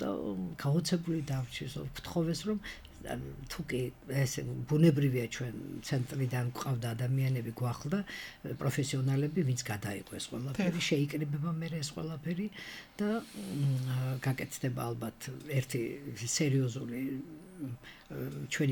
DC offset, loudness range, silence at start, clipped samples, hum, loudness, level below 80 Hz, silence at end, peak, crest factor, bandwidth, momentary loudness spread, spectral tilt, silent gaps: under 0.1%; 3 LU; 0 s; under 0.1%; none; -35 LUFS; -58 dBFS; 0 s; -14 dBFS; 20 dB; 18.5 kHz; 11 LU; -5.5 dB/octave; none